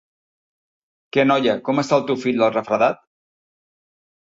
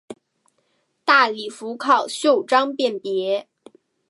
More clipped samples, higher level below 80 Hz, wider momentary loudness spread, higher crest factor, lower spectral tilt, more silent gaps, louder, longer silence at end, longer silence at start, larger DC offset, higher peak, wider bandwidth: neither; first, -64 dBFS vs -82 dBFS; second, 5 LU vs 11 LU; about the same, 18 dB vs 20 dB; first, -5.5 dB/octave vs -2.5 dB/octave; neither; about the same, -19 LUFS vs -20 LUFS; first, 1.25 s vs 0.65 s; first, 1.15 s vs 0.1 s; neither; about the same, -4 dBFS vs -2 dBFS; second, 8 kHz vs 11.5 kHz